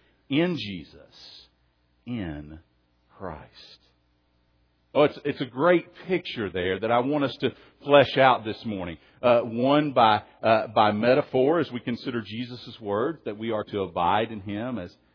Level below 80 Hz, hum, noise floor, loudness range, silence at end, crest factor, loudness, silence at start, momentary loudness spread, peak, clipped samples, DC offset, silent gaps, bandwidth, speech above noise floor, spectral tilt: -60 dBFS; none; -67 dBFS; 17 LU; 0.25 s; 22 dB; -25 LUFS; 0.3 s; 16 LU; -4 dBFS; under 0.1%; under 0.1%; none; 5.4 kHz; 42 dB; -8 dB/octave